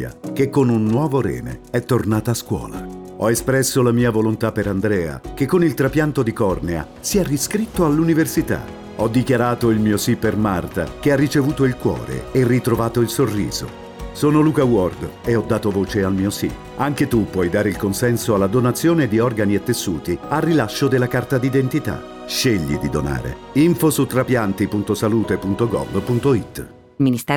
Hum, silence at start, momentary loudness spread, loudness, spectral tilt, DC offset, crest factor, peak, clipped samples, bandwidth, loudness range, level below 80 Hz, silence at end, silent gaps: none; 0 s; 8 LU; -19 LUFS; -6 dB/octave; under 0.1%; 12 dB; -6 dBFS; under 0.1%; over 20 kHz; 1 LU; -40 dBFS; 0 s; none